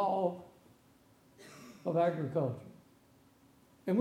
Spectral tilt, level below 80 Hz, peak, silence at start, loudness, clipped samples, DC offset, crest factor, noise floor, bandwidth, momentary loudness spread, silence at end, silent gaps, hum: -8 dB/octave; -78 dBFS; -18 dBFS; 0 s; -35 LUFS; under 0.1%; under 0.1%; 18 dB; -65 dBFS; 16 kHz; 24 LU; 0 s; none; none